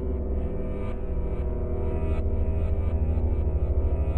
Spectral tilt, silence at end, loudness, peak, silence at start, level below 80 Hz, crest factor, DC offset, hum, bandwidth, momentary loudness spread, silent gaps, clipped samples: -11 dB/octave; 0 s; -29 LUFS; -14 dBFS; 0 s; -28 dBFS; 10 dB; 1%; none; 3.2 kHz; 5 LU; none; under 0.1%